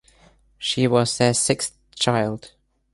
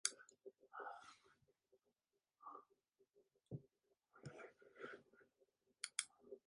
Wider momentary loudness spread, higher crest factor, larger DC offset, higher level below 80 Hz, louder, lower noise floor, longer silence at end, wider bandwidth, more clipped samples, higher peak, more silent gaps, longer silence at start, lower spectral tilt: second, 10 LU vs 16 LU; second, 20 dB vs 40 dB; neither; first, -56 dBFS vs -90 dBFS; first, -21 LUFS vs -54 LUFS; second, -56 dBFS vs under -90 dBFS; first, 0.45 s vs 0.1 s; about the same, 11.5 kHz vs 11 kHz; neither; first, -4 dBFS vs -18 dBFS; neither; first, 0.6 s vs 0.05 s; first, -4 dB/octave vs -1.5 dB/octave